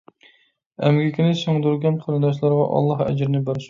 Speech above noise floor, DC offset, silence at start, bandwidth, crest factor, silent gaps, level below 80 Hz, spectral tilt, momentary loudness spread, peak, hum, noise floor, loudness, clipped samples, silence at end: 41 dB; under 0.1%; 0.8 s; 7.4 kHz; 18 dB; none; -58 dBFS; -8 dB/octave; 3 LU; -4 dBFS; none; -60 dBFS; -20 LUFS; under 0.1%; 0 s